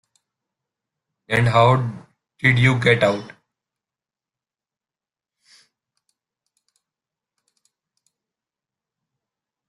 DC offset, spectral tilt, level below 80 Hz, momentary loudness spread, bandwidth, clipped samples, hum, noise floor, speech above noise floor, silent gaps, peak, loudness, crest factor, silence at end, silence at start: under 0.1%; -6.5 dB/octave; -54 dBFS; 14 LU; 11.5 kHz; under 0.1%; none; under -90 dBFS; over 73 dB; none; -2 dBFS; -18 LUFS; 22 dB; 6.4 s; 1.3 s